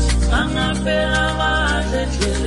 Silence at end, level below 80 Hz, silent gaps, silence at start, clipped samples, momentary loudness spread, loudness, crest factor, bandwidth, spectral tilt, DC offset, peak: 0 s; -22 dBFS; none; 0 s; under 0.1%; 3 LU; -18 LUFS; 12 dB; 11.5 kHz; -4.5 dB/octave; under 0.1%; -4 dBFS